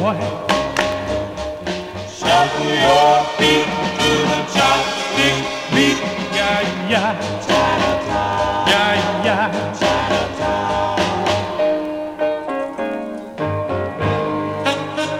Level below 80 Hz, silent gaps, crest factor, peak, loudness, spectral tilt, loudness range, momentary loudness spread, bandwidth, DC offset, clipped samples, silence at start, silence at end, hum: -42 dBFS; none; 16 dB; -2 dBFS; -18 LUFS; -4 dB/octave; 6 LU; 9 LU; 16 kHz; under 0.1%; under 0.1%; 0 s; 0 s; none